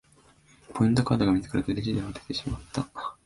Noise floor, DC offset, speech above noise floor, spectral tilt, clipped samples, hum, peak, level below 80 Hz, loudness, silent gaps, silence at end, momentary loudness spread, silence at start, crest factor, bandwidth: -59 dBFS; under 0.1%; 32 dB; -6.5 dB/octave; under 0.1%; none; -10 dBFS; -48 dBFS; -28 LUFS; none; 0.15 s; 10 LU; 0.7 s; 18 dB; 11.5 kHz